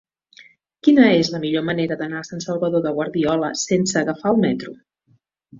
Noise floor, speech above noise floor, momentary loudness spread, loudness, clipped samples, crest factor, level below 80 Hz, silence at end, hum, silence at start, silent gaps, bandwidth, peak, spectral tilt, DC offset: -62 dBFS; 43 dB; 13 LU; -19 LUFS; under 0.1%; 18 dB; -58 dBFS; 0 s; none; 0.4 s; none; 7.8 kHz; -2 dBFS; -5 dB/octave; under 0.1%